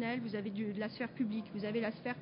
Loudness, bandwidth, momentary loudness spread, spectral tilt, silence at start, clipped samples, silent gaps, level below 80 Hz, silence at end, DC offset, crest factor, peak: -39 LUFS; 5.2 kHz; 3 LU; -5 dB/octave; 0 s; under 0.1%; none; -74 dBFS; 0 s; under 0.1%; 12 dB; -26 dBFS